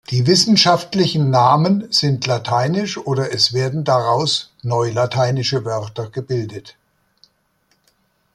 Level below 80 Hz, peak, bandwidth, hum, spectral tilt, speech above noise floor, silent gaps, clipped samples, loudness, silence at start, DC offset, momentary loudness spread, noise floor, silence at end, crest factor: -56 dBFS; -2 dBFS; 12.5 kHz; none; -5 dB/octave; 46 dB; none; under 0.1%; -17 LUFS; 0.1 s; under 0.1%; 11 LU; -63 dBFS; 1.65 s; 16 dB